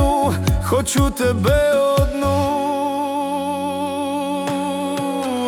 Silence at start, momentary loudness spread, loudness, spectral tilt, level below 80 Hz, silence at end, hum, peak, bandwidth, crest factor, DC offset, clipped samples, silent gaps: 0 s; 6 LU; -19 LUFS; -5.5 dB/octave; -30 dBFS; 0 s; none; -6 dBFS; 18.5 kHz; 14 dB; under 0.1%; under 0.1%; none